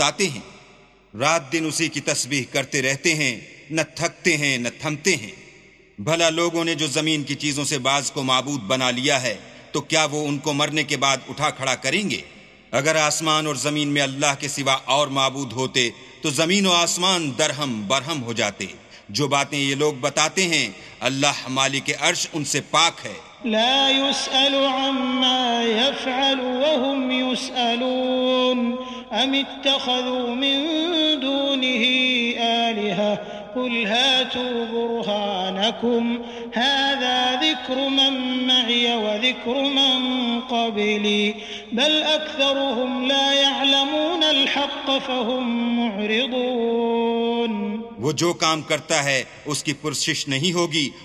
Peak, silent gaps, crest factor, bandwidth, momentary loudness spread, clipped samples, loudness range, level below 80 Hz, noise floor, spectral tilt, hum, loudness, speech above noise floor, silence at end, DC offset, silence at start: 0 dBFS; none; 22 dB; 14 kHz; 8 LU; under 0.1%; 3 LU; -62 dBFS; -51 dBFS; -3 dB/octave; none; -20 LUFS; 29 dB; 0 s; under 0.1%; 0 s